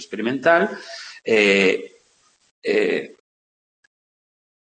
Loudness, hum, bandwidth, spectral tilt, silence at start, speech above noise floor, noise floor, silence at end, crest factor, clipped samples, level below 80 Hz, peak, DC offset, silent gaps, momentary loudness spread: -19 LUFS; none; 8.8 kHz; -4.5 dB/octave; 0 s; 41 dB; -61 dBFS; 1.6 s; 22 dB; under 0.1%; -74 dBFS; -2 dBFS; under 0.1%; 2.51-2.62 s; 17 LU